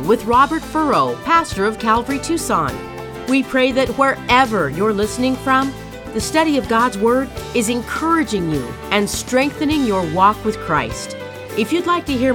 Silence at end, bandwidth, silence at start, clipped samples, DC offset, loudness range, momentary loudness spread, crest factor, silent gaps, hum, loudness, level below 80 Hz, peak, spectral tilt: 0 s; 19 kHz; 0 s; under 0.1%; under 0.1%; 1 LU; 9 LU; 16 dB; none; none; -17 LUFS; -40 dBFS; 0 dBFS; -4.5 dB/octave